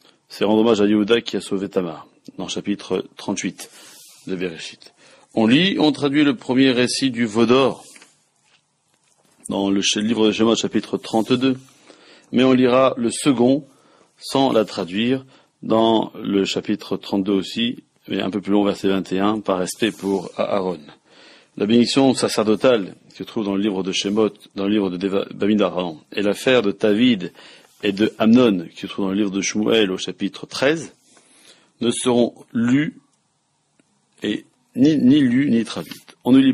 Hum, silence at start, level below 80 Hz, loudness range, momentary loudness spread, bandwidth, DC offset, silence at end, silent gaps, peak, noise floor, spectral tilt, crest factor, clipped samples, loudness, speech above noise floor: none; 0.3 s; -62 dBFS; 4 LU; 13 LU; 14 kHz; under 0.1%; 0 s; none; -4 dBFS; -67 dBFS; -5 dB/octave; 16 dB; under 0.1%; -19 LUFS; 48 dB